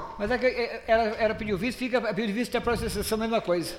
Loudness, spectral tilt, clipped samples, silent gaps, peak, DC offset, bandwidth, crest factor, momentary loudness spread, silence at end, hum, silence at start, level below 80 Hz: -27 LUFS; -5 dB/octave; under 0.1%; none; -10 dBFS; under 0.1%; 16 kHz; 16 dB; 4 LU; 0 s; none; 0 s; -46 dBFS